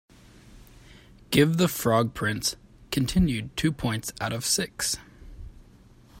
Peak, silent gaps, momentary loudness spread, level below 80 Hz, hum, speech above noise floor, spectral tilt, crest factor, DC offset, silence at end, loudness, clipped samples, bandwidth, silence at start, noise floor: -6 dBFS; none; 9 LU; -44 dBFS; none; 28 dB; -4.5 dB/octave; 22 dB; under 0.1%; 0 s; -26 LUFS; under 0.1%; 16.5 kHz; 0.55 s; -53 dBFS